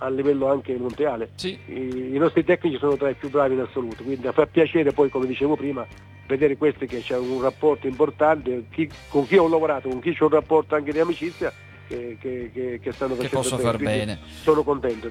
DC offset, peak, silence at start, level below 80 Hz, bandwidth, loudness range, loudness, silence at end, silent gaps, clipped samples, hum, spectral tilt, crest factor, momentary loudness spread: under 0.1%; -4 dBFS; 0 s; -52 dBFS; 13.5 kHz; 4 LU; -23 LUFS; 0 s; none; under 0.1%; none; -6 dB/octave; 18 dB; 11 LU